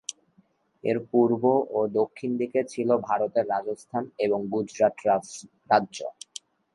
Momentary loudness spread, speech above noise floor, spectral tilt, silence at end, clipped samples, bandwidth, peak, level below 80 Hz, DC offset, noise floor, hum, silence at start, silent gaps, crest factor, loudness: 14 LU; 39 dB; -5.5 dB/octave; 0.65 s; under 0.1%; 11.5 kHz; -6 dBFS; -72 dBFS; under 0.1%; -64 dBFS; none; 0.1 s; none; 20 dB; -26 LUFS